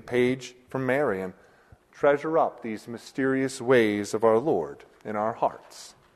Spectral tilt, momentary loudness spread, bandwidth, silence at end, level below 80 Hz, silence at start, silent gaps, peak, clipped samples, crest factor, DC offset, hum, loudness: -5.5 dB/octave; 15 LU; 13.5 kHz; 0.25 s; -64 dBFS; 0.05 s; none; -8 dBFS; under 0.1%; 18 dB; under 0.1%; none; -26 LUFS